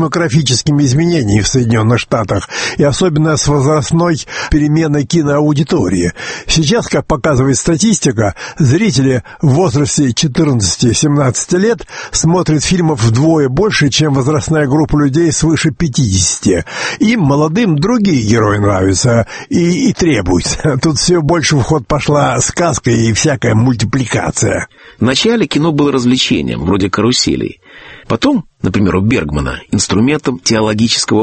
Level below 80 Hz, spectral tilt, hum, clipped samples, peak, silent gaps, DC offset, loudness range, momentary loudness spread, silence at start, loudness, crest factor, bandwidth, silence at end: -32 dBFS; -5 dB/octave; none; under 0.1%; 0 dBFS; none; under 0.1%; 1 LU; 4 LU; 0 s; -12 LUFS; 12 dB; 8.8 kHz; 0 s